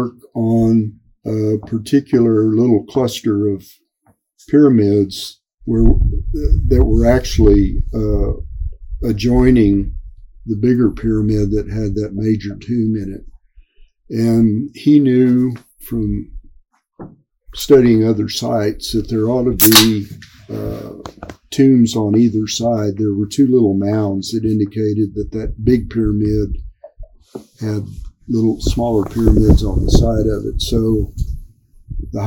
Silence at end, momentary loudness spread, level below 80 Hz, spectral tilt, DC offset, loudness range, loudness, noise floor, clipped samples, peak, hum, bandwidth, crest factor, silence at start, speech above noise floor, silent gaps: 0 s; 16 LU; -24 dBFS; -6 dB/octave; under 0.1%; 6 LU; -15 LUFS; -58 dBFS; under 0.1%; 0 dBFS; none; 17 kHz; 16 dB; 0 s; 44 dB; none